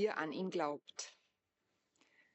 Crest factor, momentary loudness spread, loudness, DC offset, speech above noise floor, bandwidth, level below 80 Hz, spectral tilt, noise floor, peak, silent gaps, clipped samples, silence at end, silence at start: 20 dB; 10 LU; -41 LUFS; under 0.1%; 45 dB; 8 kHz; under -90 dBFS; -3.5 dB/octave; -85 dBFS; -22 dBFS; none; under 0.1%; 1.25 s; 0 s